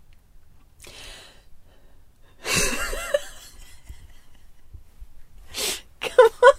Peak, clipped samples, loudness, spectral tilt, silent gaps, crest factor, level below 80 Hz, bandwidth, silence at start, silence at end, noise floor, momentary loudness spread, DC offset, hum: -2 dBFS; under 0.1%; -22 LUFS; -2 dB/octave; none; 24 dB; -42 dBFS; 16 kHz; 0.85 s; 0 s; -49 dBFS; 27 LU; under 0.1%; none